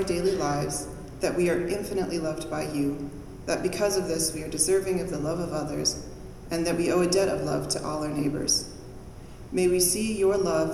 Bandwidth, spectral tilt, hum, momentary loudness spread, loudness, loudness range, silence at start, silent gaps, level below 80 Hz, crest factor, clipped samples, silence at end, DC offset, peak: 15.5 kHz; -4 dB/octave; none; 15 LU; -27 LUFS; 2 LU; 0 s; none; -46 dBFS; 16 dB; under 0.1%; 0 s; under 0.1%; -10 dBFS